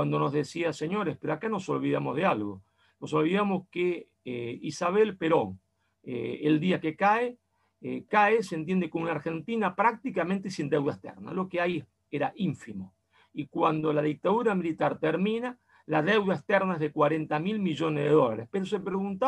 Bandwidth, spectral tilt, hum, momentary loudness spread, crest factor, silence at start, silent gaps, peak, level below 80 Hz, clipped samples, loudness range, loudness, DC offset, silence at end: 11.5 kHz; -7 dB/octave; none; 12 LU; 18 dB; 0 s; none; -10 dBFS; -72 dBFS; under 0.1%; 3 LU; -28 LUFS; under 0.1%; 0 s